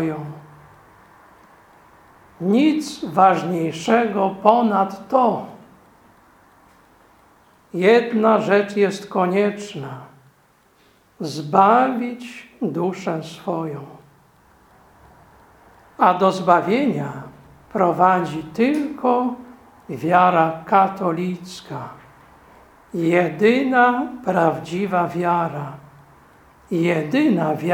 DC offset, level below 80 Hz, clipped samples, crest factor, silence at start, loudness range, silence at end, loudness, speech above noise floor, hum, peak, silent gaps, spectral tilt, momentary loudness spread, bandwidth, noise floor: under 0.1%; -62 dBFS; under 0.1%; 20 dB; 0 s; 5 LU; 0 s; -19 LUFS; 38 dB; none; 0 dBFS; none; -6.5 dB/octave; 16 LU; 17 kHz; -57 dBFS